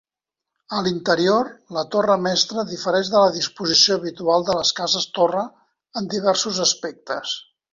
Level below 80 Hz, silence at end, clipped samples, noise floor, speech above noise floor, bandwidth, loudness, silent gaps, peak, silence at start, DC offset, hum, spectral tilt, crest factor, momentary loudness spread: -62 dBFS; 0.3 s; under 0.1%; -86 dBFS; 66 dB; 7.6 kHz; -20 LUFS; none; -2 dBFS; 0.7 s; under 0.1%; none; -3 dB/octave; 20 dB; 11 LU